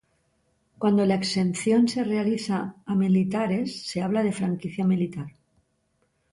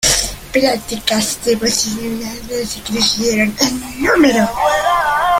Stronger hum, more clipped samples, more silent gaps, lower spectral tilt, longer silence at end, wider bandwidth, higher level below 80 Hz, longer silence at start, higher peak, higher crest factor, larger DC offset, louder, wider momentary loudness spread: neither; neither; neither; first, -6.5 dB/octave vs -2.5 dB/octave; first, 1.05 s vs 0 s; second, 11.5 kHz vs 17 kHz; second, -64 dBFS vs -36 dBFS; first, 0.8 s vs 0 s; second, -10 dBFS vs 0 dBFS; about the same, 14 dB vs 16 dB; neither; second, -25 LUFS vs -15 LUFS; about the same, 8 LU vs 10 LU